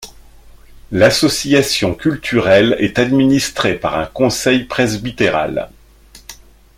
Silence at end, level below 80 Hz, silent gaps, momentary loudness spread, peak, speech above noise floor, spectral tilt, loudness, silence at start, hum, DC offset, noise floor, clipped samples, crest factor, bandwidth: 0.45 s; -42 dBFS; none; 8 LU; 0 dBFS; 29 dB; -4.5 dB/octave; -14 LUFS; 0 s; none; under 0.1%; -43 dBFS; under 0.1%; 16 dB; 16.5 kHz